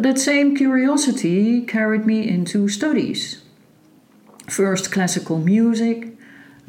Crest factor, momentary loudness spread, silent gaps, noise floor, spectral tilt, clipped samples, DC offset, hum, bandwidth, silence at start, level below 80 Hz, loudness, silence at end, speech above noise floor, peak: 12 dB; 9 LU; none; -52 dBFS; -4.5 dB/octave; under 0.1%; under 0.1%; none; 16.5 kHz; 0 s; -70 dBFS; -19 LUFS; 0.55 s; 34 dB; -6 dBFS